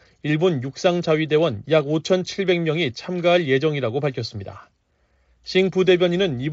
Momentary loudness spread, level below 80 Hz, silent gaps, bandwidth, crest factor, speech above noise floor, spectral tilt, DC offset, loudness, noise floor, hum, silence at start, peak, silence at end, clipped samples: 8 LU; -58 dBFS; none; 7.8 kHz; 16 dB; 44 dB; -5 dB/octave; under 0.1%; -21 LUFS; -64 dBFS; none; 0.25 s; -6 dBFS; 0 s; under 0.1%